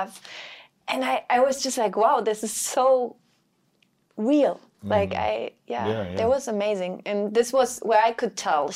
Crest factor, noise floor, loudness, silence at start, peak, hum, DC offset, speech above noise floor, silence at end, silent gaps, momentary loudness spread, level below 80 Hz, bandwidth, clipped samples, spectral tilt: 18 dB; -67 dBFS; -24 LUFS; 0 s; -6 dBFS; none; under 0.1%; 44 dB; 0 s; none; 13 LU; -64 dBFS; 16 kHz; under 0.1%; -4 dB/octave